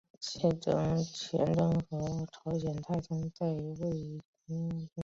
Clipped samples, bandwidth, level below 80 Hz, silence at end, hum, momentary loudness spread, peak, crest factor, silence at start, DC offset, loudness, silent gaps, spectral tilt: under 0.1%; 7.8 kHz; -58 dBFS; 0 s; none; 9 LU; -16 dBFS; 18 dB; 0.2 s; under 0.1%; -34 LUFS; 4.25-4.33 s; -7 dB/octave